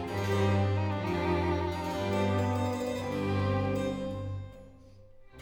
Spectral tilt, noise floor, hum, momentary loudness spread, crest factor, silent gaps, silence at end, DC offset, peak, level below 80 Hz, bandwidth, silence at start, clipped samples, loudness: -7 dB/octave; -53 dBFS; none; 8 LU; 14 dB; none; 0 s; under 0.1%; -16 dBFS; -52 dBFS; 16 kHz; 0 s; under 0.1%; -31 LUFS